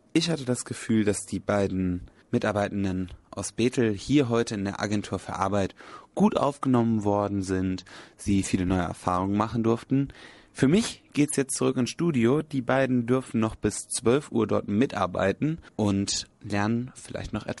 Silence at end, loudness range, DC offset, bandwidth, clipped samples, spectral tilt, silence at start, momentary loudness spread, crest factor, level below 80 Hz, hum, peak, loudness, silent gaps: 0 s; 2 LU; under 0.1%; 11.5 kHz; under 0.1%; -5.5 dB/octave; 0.15 s; 10 LU; 18 dB; -52 dBFS; none; -8 dBFS; -26 LUFS; none